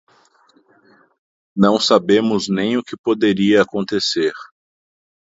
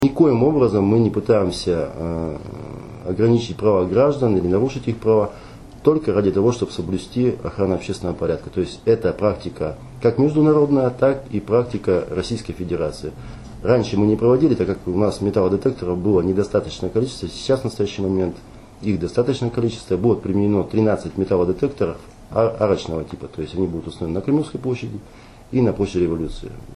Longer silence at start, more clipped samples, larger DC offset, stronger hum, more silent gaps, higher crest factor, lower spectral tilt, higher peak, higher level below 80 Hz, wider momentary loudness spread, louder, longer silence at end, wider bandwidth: first, 1.55 s vs 0 s; neither; neither; neither; first, 2.99-3.04 s vs none; about the same, 18 dB vs 16 dB; second, -5 dB/octave vs -7.5 dB/octave; about the same, 0 dBFS vs -2 dBFS; second, -58 dBFS vs -42 dBFS; second, 8 LU vs 11 LU; first, -17 LUFS vs -20 LUFS; first, 0.9 s vs 0 s; second, 8 kHz vs 12 kHz